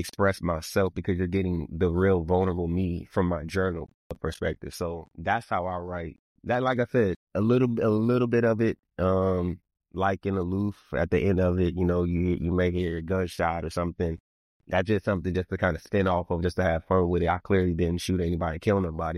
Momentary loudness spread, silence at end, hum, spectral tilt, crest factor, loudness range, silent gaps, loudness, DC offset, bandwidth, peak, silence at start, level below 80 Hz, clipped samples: 8 LU; 0 s; none; -7.5 dB/octave; 16 dB; 4 LU; 3.94-4.10 s, 6.19-6.35 s, 7.16-7.27 s, 14.20-14.60 s; -27 LUFS; under 0.1%; 13.5 kHz; -10 dBFS; 0 s; -44 dBFS; under 0.1%